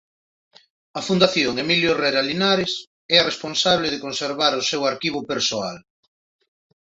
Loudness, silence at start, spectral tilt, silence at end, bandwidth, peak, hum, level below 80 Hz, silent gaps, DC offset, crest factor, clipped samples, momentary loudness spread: -20 LUFS; 0.95 s; -3.5 dB/octave; 1 s; 8 kHz; -2 dBFS; none; -58 dBFS; 2.87-3.09 s; under 0.1%; 20 dB; under 0.1%; 9 LU